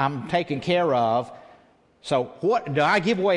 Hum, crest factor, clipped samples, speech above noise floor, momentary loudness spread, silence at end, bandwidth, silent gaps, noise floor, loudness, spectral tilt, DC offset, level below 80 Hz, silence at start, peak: none; 16 dB; under 0.1%; 34 dB; 6 LU; 0 s; 11 kHz; none; -57 dBFS; -23 LUFS; -6 dB/octave; under 0.1%; -62 dBFS; 0 s; -6 dBFS